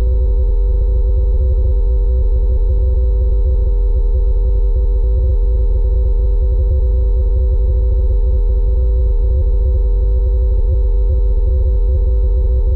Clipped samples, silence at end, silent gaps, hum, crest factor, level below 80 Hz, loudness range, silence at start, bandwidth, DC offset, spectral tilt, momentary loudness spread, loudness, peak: under 0.1%; 0 s; none; none; 4 dB; -12 dBFS; 0 LU; 0 s; 1.3 kHz; under 0.1%; -12.5 dB/octave; 1 LU; -16 LUFS; -8 dBFS